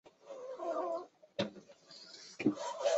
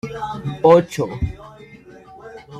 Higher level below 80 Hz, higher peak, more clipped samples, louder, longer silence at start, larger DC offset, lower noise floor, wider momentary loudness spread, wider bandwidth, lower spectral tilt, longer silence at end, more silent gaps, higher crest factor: second, -80 dBFS vs -40 dBFS; second, -18 dBFS vs -2 dBFS; neither; second, -40 LUFS vs -18 LUFS; about the same, 0.05 s vs 0.05 s; neither; first, -57 dBFS vs -43 dBFS; second, 17 LU vs 26 LU; second, 8 kHz vs 14 kHz; second, -4 dB/octave vs -7 dB/octave; about the same, 0 s vs 0 s; neither; about the same, 22 dB vs 18 dB